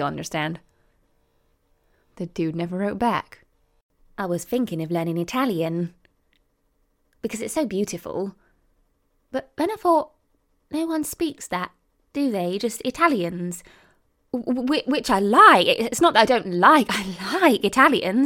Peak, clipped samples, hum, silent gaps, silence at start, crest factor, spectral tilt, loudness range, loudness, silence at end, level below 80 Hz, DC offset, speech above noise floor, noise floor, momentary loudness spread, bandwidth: -2 dBFS; under 0.1%; none; 3.82-3.89 s; 0 s; 22 dB; -4.5 dB/octave; 12 LU; -21 LUFS; 0 s; -58 dBFS; under 0.1%; 46 dB; -68 dBFS; 16 LU; 17.5 kHz